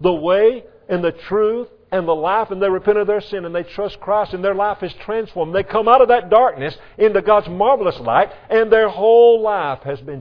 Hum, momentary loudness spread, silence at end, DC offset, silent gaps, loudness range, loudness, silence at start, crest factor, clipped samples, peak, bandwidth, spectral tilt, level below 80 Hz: none; 12 LU; 0 s; under 0.1%; none; 5 LU; -16 LUFS; 0 s; 16 dB; under 0.1%; 0 dBFS; 5.4 kHz; -8 dB/octave; -48 dBFS